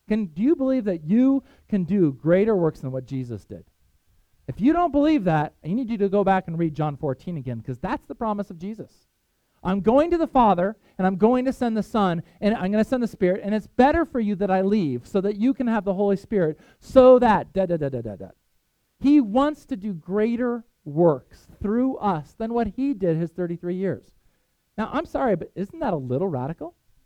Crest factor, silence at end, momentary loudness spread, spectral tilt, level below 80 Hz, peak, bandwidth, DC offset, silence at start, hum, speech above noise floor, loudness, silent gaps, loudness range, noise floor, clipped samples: 22 dB; 0.35 s; 13 LU; -8.5 dB/octave; -48 dBFS; -2 dBFS; 10.5 kHz; under 0.1%; 0.1 s; none; 47 dB; -23 LUFS; none; 7 LU; -69 dBFS; under 0.1%